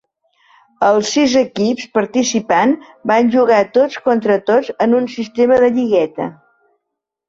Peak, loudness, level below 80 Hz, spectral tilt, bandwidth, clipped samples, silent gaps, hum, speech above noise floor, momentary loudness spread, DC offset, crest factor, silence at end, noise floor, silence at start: -2 dBFS; -15 LUFS; -58 dBFS; -4.5 dB/octave; 7.8 kHz; under 0.1%; none; none; 64 dB; 6 LU; under 0.1%; 12 dB; 0.95 s; -78 dBFS; 0.8 s